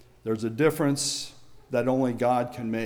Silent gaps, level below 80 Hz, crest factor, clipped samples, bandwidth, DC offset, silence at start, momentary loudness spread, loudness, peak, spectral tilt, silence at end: none; -62 dBFS; 16 dB; under 0.1%; over 20 kHz; under 0.1%; 0.25 s; 8 LU; -26 LUFS; -12 dBFS; -4.5 dB/octave; 0 s